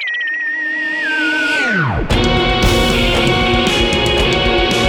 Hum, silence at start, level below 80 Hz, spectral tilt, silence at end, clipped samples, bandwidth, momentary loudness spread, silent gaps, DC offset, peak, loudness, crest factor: none; 0 s; -24 dBFS; -4.5 dB/octave; 0 s; under 0.1%; over 20 kHz; 4 LU; none; under 0.1%; 0 dBFS; -14 LUFS; 14 dB